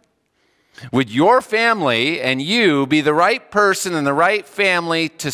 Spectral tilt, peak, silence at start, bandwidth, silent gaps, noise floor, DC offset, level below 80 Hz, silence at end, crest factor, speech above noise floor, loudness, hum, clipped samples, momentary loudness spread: -4 dB/octave; -2 dBFS; 0.8 s; 16 kHz; none; -64 dBFS; under 0.1%; -62 dBFS; 0 s; 16 dB; 47 dB; -16 LUFS; none; under 0.1%; 5 LU